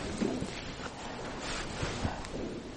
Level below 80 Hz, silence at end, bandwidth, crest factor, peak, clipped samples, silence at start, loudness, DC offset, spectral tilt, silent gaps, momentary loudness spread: -48 dBFS; 0 s; 11 kHz; 18 dB; -18 dBFS; under 0.1%; 0 s; -37 LUFS; under 0.1%; -4.5 dB/octave; none; 6 LU